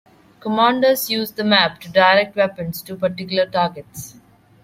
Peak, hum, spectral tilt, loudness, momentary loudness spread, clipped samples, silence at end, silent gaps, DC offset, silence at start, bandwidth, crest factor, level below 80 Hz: -2 dBFS; none; -4 dB/octave; -18 LUFS; 17 LU; under 0.1%; 0.55 s; none; under 0.1%; 0.45 s; 16.5 kHz; 18 dB; -58 dBFS